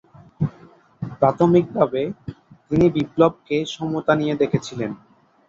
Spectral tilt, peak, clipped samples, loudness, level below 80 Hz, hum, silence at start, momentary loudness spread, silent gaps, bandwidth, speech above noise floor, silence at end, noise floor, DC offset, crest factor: -7.5 dB/octave; -2 dBFS; under 0.1%; -21 LUFS; -50 dBFS; none; 0.4 s; 15 LU; none; 7.6 kHz; 30 dB; 0.55 s; -49 dBFS; under 0.1%; 20 dB